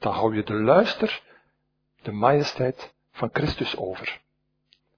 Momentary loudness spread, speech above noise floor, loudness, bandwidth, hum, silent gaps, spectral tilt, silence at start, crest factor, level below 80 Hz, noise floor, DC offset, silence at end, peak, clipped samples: 18 LU; 50 dB; -24 LUFS; 5.4 kHz; none; none; -6.5 dB/octave; 0 s; 22 dB; -52 dBFS; -73 dBFS; under 0.1%; 0.8 s; -4 dBFS; under 0.1%